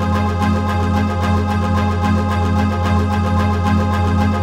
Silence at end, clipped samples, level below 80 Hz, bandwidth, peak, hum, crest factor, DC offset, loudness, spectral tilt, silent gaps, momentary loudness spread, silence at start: 0 s; under 0.1%; -36 dBFS; 11.5 kHz; -4 dBFS; none; 12 dB; under 0.1%; -17 LUFS; -7.5 dB/octave; none; 1 LU; 0 s